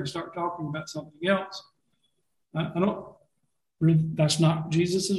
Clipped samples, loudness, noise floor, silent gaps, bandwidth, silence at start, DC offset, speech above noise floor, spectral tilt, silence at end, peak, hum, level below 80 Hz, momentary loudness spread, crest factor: under 0.1%; -27 LUFS; -79 dBFS; none; 12.5 kHz; 0 s; under 0.1%; 53 dB; -5.5 dB/octave; 0 s; -10 dBFS; none; -60 dBFS; 14 LU; 18 dB